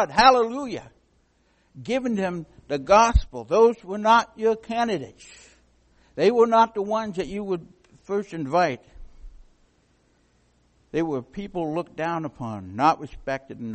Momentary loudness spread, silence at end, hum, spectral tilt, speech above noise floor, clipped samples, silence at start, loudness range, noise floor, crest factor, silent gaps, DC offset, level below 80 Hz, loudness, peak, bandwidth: 15 LU; 0 s; none; -5 dB/octave; 42 dB; under 0.1%; 0 s; 10 LU; -64 dBFS; 22 dB; none; under 0.1%; -38 dBFS; -23 LUFS; -2 dBFS; 8.4 kHz